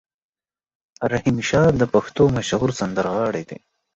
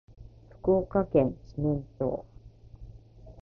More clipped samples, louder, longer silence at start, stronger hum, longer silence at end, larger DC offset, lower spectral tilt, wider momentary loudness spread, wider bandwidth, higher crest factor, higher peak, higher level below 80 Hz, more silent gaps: neither; first, -20 LUFS vs -29 LUFS; first, 1 s vs 0.2 s; neither; first, 0.4 s vs 0 s; neither; second, -6 dB/octave vs -11.5 dB/octave; second, 11 LU vs 14 LU; first, 8.2 kHz vs 6 kHz; about the same, 18 dB vs 20 dB; first, -4 dBFS vs -10 dBFS; about the same, -46 dBFS vs -48 dBFS; neither